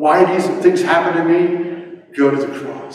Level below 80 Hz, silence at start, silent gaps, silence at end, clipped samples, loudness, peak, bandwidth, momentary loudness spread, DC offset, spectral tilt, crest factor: -66 dBFS; 0 s; none; 0 s; under 0.1%; -15 LUFS; 0 dBFS; 11.5 kHz; 14 LU; under 0.1%; -6 dB/octave; 14 dB